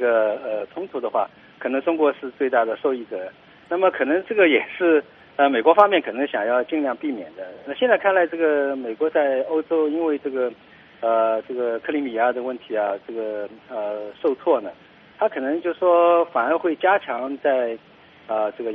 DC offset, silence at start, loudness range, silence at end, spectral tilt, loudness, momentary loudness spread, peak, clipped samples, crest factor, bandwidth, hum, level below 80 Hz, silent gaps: under 0.1%; 0 s; 6 LU; 0 s; -1.5 dB/octave; -21 LUFS; 12 LU; 0 dBFS; under 0.1%; 22 dB; 4.6 kHz; none; -70 dBFS; none